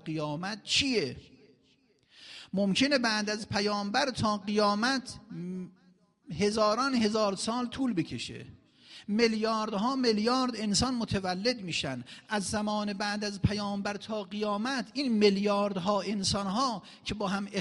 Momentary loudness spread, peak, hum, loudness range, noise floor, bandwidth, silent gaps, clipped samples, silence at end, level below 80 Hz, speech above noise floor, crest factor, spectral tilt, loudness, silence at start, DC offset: 12 LU; -12 dBFS; none; 2 LU; -67 dBFS; 11.5 kHz; none; under 0.1%; 0 s; -58 dBFS; 37 dB; 18 dB; -4.5 dB/octave; -30 LUFS; 0.05 s; under 0.1%